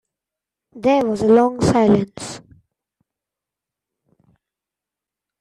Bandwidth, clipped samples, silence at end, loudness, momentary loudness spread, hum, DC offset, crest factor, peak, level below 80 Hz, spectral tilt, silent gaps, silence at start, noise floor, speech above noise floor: 11.5 kHz; under 0.1%; 3 s; -17 LUFS; 18 LU; none; under 0.1%; 18 dB; -4 dBFS; -52 dBFS; -6.5 dB/octave; none; 0.75 s; -87 dBFS; 71 dB